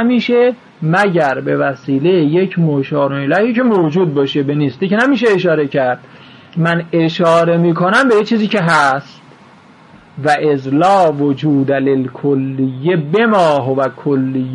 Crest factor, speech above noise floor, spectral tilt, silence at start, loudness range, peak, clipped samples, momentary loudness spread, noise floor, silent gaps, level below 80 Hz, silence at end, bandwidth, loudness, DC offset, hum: 12 dB; 29 dB; -7 dB/octave; 0 s; 2 LU; -2 dBFS; under 0.1%; 6 LU; -42 dBFS; none; -60 dBFS; 0 s; 10.5 kHz; -13 LUFS; under 0.1%; none